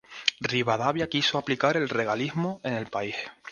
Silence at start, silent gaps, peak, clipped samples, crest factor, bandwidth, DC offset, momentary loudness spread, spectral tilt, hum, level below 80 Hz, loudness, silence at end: 0.1 s; none; -4 dBFS; under 0.1%; 24 dB; 10.5 kHz; under 0.1%; 7 LU; -4.5 dB/octave; none; -62 dBFS; -27 LUFS; 0 s